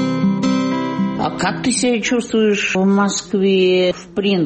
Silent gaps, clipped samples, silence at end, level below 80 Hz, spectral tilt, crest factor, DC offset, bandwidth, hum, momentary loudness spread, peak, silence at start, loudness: none; under 0.1%; 0 s; -52 dBFS; -5 dB/octave; 10 dB; under 0.1%; 8.8 kHz; none; 5 LU; -6 dBFS; 0 s; -17 LUFS